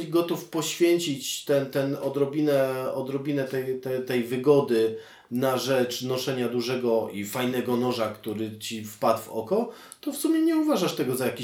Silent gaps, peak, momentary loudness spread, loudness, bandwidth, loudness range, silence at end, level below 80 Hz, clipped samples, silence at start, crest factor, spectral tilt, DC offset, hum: none; -8 dBFS; 8 LU; -26 LUFS; 18 kHz; 2 LU; 0 s; -76 dBFS; under 0.1%; 0 s; 18 dB; -5 dB/octave; under 0.1%; none